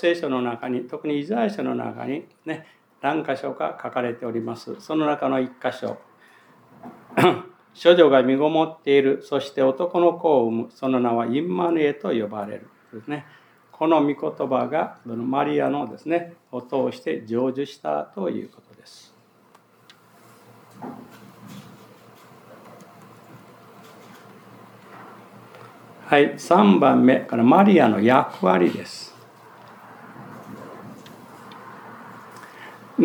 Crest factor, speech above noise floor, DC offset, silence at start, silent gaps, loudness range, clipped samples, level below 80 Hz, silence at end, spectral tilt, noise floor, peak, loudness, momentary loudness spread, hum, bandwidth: 22 dB; 35 dB; under 0.1%; 0 s; none; 13 LU; under 0.1%; -80 dBFS; 0 s; -7 dB/octave; -56 dBFS; -2 dBFS; -21 LUFS; 25 LU; none; 20 kHz